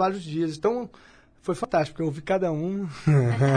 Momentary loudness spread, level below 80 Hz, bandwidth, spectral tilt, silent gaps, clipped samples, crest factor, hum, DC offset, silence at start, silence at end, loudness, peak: 10 LU; -56 dBFS; 10.5 kHz; -7.5 dB/octave; none; under 0.1%; 16 dB; none; under 0.1%; 0 s; 0 s; -26 LUFS; -10 dBFS